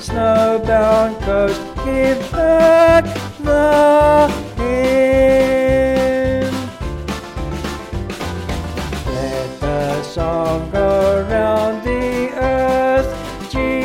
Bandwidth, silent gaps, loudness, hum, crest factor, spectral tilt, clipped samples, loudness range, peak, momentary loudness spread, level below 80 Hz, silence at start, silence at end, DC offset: 16 kHz; none; -16 LUFS; none; 14 dB; -6 dB/octave; under 0.1%; 10 LU; -2 dBFS; 13 LU; -30 dBFS; 0 s; 0 s; under 0.1%